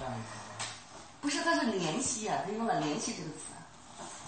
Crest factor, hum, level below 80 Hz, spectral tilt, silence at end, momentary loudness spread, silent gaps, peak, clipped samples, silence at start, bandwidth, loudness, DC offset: 18 dB; none; -66 dBFS; -3 dB/octave; 0 s; 17 LU; none; -16 dBFS; under 0.1%; 0 s; 8.8 kHz; -34 LUFS; under 0.1%